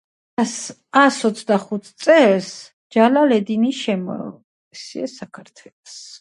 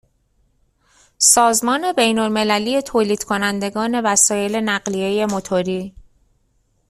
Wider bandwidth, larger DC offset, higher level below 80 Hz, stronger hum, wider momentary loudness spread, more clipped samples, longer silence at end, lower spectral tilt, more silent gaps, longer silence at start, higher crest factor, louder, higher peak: second, 11.5 kHz vs 15.5 kHz; neither; second, -70 dBFS vs -54 dBFS; neither; first, 23 LU vs 8 LU; neither; second, 0.05 s vs 1 s; first, -4.5 dB/octave vs -2.5 dB/octave; first, 2.73-2.90 s, 4.44-4.71 s, 5.73-5.83 s vs none; second, 0.4 s vs 1.2 s; about the same, 18 dB vs 20 dB; about the same, -18 LUFS vs -17 LUFS; about the same, 0 dBFS vs 0 dBFS